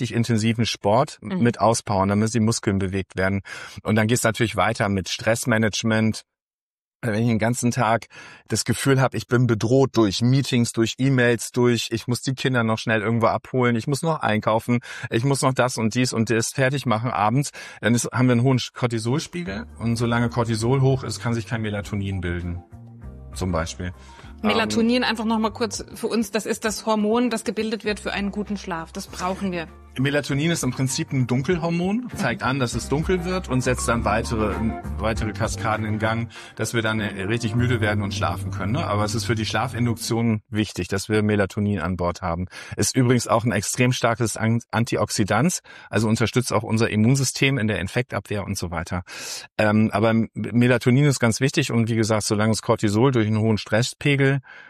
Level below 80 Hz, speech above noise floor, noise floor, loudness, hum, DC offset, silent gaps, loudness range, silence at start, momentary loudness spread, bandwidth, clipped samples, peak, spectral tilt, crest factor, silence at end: -44 dBFS; over 68 dB; under -90 dBFS; -22 LUFS; none; under 0.1%; 6.42-7.00 s, 49.52-49.56 s; 4 LU; 0 s; 8 LU; 14 kHz; under 0.1%; -6 dBFS; -5.5 dB/octave; 16 dB; 0 s